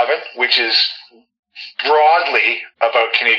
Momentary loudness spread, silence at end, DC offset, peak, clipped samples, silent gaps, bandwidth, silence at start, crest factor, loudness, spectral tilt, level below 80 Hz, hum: 13 LU; 0 s; under 0.1%; 0 dBFS; under 0.1%; 1.39-1.43 s; 7.4 kHz; 0 s; 16 dB; -14 LUFS; -0.5 dB/octave; -84 dBFS; none